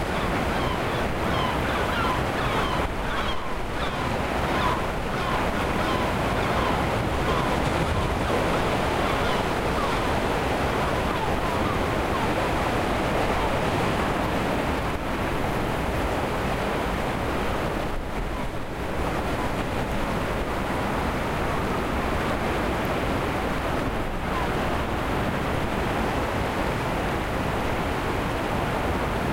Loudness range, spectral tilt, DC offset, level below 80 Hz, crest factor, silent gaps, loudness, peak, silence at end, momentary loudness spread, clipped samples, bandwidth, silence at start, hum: 3 LU; -5.5 dB/octave; under 0.1%; -34 dBFS; 14 dB; none; -26 LUFS; -10 dBFS; 0 s; 3 LU; under 0.1%; 16 kHz; 0 s; none